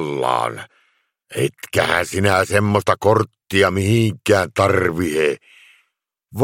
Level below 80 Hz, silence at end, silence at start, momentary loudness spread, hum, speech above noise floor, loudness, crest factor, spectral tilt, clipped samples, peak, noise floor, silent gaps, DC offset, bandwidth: -52 dBFS; 0 s; 0 s; 7 LU; none; 54 dB; -18 LUFS; 18 dB; -5.5 dB/octave; under 0.1%; 0 dBFS; -72 dBFS; none; under 0.1%; 16.5 kHz